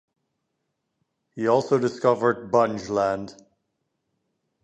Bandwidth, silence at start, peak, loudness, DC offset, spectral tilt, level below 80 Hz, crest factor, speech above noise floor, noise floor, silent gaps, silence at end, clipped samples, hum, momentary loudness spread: 8.8 kHz; 1.35 s; -6 dBFS; -23 LUFS; under 0.1%; -6.5 dB/octave; -64 dBFS; 20 dB; 55 dB; -78 dBFS; none; 1.3 s; under 0.1%; none; 7 LU